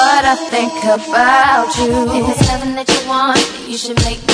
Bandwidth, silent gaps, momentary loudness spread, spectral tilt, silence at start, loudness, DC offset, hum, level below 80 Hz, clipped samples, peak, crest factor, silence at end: 11 kHz; none; 7 LU; -3.5 dB/octave; 0 s; -13 LUFS; under 0.1%; none; -30 dBFS; under 0.1%; 0 dBFS; 14 dB; 0 s